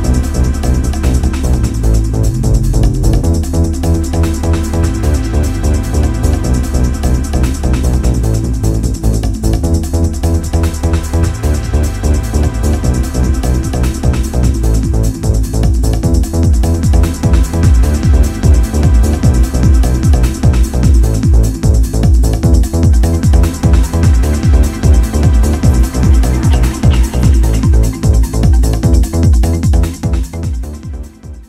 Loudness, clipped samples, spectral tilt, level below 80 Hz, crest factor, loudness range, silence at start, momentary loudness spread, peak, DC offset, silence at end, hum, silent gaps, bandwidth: -12 LUFS; under 0.1%; -6.5 dB/octave; -12 dBFS; 10 dB; 3 LU; 0 s; 4 LU; 0 dBFS; under 0.1%; 0.05 s; none; none; 14.5 kHz